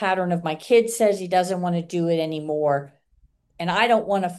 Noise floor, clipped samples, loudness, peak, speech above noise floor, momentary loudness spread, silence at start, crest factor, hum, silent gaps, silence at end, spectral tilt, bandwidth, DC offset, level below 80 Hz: -61 dBFS; under 0.1%; -22 LUFS; -4 dBFS; 39 dB; 7 LU; 0 s; 18 dB; none; none; 0 s; -5 dB/octave; 12.5 kHz; under 0.1%; -64 dBFS